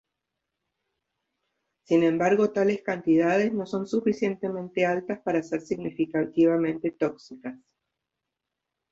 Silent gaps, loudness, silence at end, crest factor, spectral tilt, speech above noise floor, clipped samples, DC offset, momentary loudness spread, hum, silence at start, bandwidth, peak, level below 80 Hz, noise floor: none; -25 LUFS; 1.35 s; 16 dB; -7 dB/octave; 60 dB; under 0.1%; under 0.1%; 9 LU; none; 1.9 s; 7.6 kHz; -10 dBFS; -68 dBFS; -85 dBFS